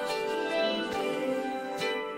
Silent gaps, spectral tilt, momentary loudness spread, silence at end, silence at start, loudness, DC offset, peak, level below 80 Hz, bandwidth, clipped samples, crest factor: none; -3.5 dB/octave; 4 LU; 0 s; 0 s; -31 LUFS; under 0.1%; -16 dBFS; -68 dBFS; 16 kHz; under 0.1%; 14 dB